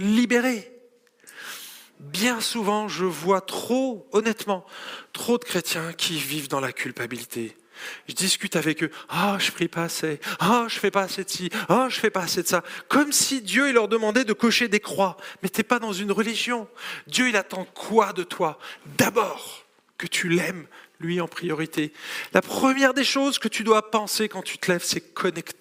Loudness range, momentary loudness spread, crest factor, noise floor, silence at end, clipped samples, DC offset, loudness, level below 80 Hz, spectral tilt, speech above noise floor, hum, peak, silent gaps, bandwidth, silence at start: 5 LU; 14 LU; 24 dB; -56 dBFS; 0.1 s; under 0.1%; under 0.1%; -24 LUFS; -70 dBFS; -3.5 dB/octave; 32 dB; none; -2 dBFS; none; 16 kHz; 0 s